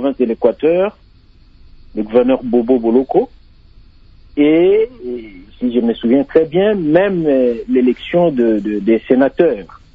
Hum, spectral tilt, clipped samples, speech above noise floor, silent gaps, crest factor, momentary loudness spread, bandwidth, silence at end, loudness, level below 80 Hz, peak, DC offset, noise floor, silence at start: none; -9.5 dB/octave; under 0.1%; 31 dB; none; 14 dB; 10 LU; 5 kHz; 0.3 s; -14 LUFS; -44 dBFS; 0 dBFS; under 0.1%; -45 dBFS; 0 s